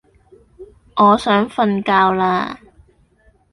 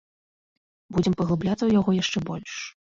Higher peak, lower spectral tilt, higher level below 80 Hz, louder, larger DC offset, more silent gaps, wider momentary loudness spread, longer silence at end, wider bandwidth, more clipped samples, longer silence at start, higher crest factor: first, -2 dBFS vs -10 dBFS; about the same, -6.5 dB/octave vs -6 dB/octave; about the same, -52 dBFS vs -52 dBFS; first, -16 LUFS vs -24 LUFS; neither; neither; about the same, 14 LU vs 12 LU; first, 0.95 s vs 0.2 s; first, 11.5 kHz vs 7.6 kHz; neither; second, 0.6 s vs 0.9 s; about the same, 16 dB vs 16 dB